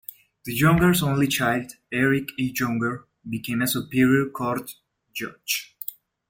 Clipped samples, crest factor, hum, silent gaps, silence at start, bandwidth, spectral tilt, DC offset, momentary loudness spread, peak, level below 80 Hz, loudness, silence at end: under 0.1%; 18 dB; none; none; 0.45 s; 17 kHz; -5 dB/octave; under 0.1%; 16 LU; -6 dBFS; -50 dBFS; -23 LUFS; 0.35 s